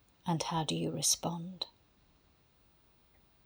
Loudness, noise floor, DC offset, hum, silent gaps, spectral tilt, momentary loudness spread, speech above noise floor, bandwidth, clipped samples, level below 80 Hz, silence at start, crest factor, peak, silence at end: -34 LUFS; -67 dBFS; under 0.1%; none; none; -3.5 dB/octave; 12 LU; 33 dB; over 20 kHz; under 0.1%; -68 dBFS; 0.25 s; 22 dB; -16 dBFS; 1.75 s